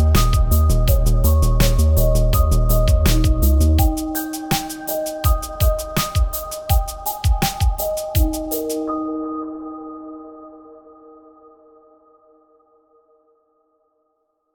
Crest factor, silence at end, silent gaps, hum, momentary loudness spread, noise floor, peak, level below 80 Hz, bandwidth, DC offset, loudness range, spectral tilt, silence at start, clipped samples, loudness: 16 dB; 3.95 s; none; none; 12 LU; -69 dBFS; -2 dBFS; -20 dBFS; 19.5 kHz; under 0.1%; 14 LU; -5.5 dB/octave; 0 s; under 0.1%; -19 LUFS